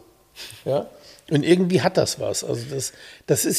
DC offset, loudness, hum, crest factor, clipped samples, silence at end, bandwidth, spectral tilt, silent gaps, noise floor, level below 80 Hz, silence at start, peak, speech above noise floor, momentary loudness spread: under 0.1%; -23 LUFS; none; 20 dB; under 0.1%; 0 s; 15.5 kHz; -4.5 dB/octave; none; -43 dBFS; -60 dBFS; 0.35 s; -4 dBFS; 21 dB; 20 LU